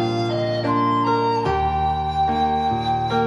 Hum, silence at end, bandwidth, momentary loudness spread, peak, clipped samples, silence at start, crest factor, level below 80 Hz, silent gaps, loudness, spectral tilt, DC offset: none; 0 s; 11 kHz; 3 LU; -8 dBFS; under 0.1%; 0 s; 12 dB; -38 dBFS; none; -21 LUFS; -7 dB/octave; under 0.1%